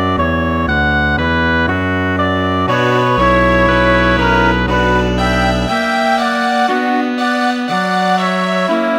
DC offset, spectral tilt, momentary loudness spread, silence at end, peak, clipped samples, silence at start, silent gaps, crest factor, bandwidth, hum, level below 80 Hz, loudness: under 0.1%; -6 dB/octave; 4 LU; 0 s; 0 dBFS; under 0.1%; 0 s; none; 12 dB; 17 kHz; none; -26 dBFS; -14 LUFS